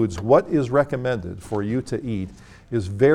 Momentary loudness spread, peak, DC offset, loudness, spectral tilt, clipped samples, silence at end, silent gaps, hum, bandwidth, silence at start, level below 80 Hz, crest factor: 11 LU; -4 dBFS; under 0.1%; -23 LUFS; -7.5 dB/octave; under 0.1%; 0 s; none; none; 12 kHz; 0 s; -46 dBFS; 18 dB